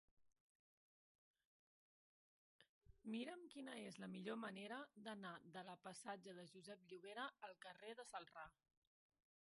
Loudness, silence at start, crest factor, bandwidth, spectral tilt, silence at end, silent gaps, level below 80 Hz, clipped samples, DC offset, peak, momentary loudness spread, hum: -55 LUFS; 0.2 s; 20 dB; 11.5 kHz; -4.5 dB/octave; 0.9 s; 0.40-1.34 s, 1.45-2.59 s, 2.69-2.81 s; -88 dBFS; under 0.1%; under 0.1%; -38 dBFS; 9 LU; none